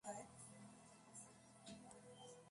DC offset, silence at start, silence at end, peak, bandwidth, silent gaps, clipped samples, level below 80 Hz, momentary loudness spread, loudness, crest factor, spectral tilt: under 0.1%; 0.05 s; 0 s; -38 dBFS; 11.5 kHz; none; under 0.1%; -84 dBFS; 7 LU; -60 LUFS; 22 dB; -3.5 dB/octave